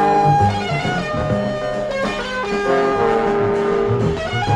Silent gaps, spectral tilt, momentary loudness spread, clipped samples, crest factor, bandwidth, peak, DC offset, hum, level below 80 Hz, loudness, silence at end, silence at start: none; -6.5 dB/octave; 6 LU; under 0.1%; 14 dB; 11 kHz; -4 dBFS; under 0.1%; none; -38 dBFS; -18 LUFS; 0 s; 0 s